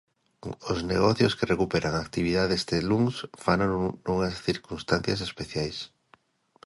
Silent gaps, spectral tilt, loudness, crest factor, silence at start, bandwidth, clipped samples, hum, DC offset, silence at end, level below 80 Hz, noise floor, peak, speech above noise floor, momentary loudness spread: none; -5.5 dB/octave; -27 LUFS; 20 dB; 0.45 s; 11.5 kHz; under 0.1%; none; under 0.1%; 0.8 s; -48 dBFS; -62 dBFS; -8 dBFS; 36 dB; 9 LU